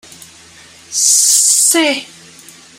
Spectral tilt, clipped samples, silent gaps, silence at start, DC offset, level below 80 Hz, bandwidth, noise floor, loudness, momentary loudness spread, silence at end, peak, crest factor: 1 dB/octave; under 0.1%; none; 0.9 s; under 0.1%; -66 dBFS; over 20 kHz; -40 dBFS; -9 LUFS; 12 LU; 0.75 s; 0 dBFS; 16 dB